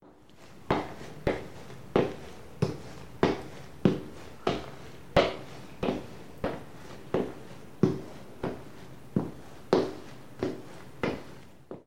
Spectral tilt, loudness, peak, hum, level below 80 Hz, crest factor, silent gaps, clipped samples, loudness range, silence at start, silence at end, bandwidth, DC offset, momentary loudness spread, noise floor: -6.5 dB/octave; -32 LUFS; -8 dBFS; none; -52 dBFS; 26 dB; none; under 0.1%; 4 LU; 0 s; 0 s; 16.5 kHz; 0.5%; 19 LU; -54 dBFS